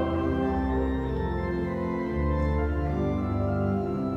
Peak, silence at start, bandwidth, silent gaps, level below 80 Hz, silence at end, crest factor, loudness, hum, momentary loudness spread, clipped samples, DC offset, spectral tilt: -16 dBFS; 0 s; 6.2 kHz; none; -34 dBFS; 0 s; 12 dB; -28 LUFS; none; 3 LU; under 0.1%; under 0.1%; -9.5 dB/octave